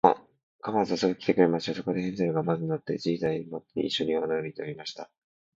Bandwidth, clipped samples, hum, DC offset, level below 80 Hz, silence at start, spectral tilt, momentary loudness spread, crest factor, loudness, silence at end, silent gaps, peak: 7.8 kHz; under 0.1%; none; under 0.1%; -66 dBFS; 0.05 s; -6.5 dB/octave; 13 LU; 24 dB; -28 LUFS; 0.5 s; 0.43-0.59 s; -4 dBFS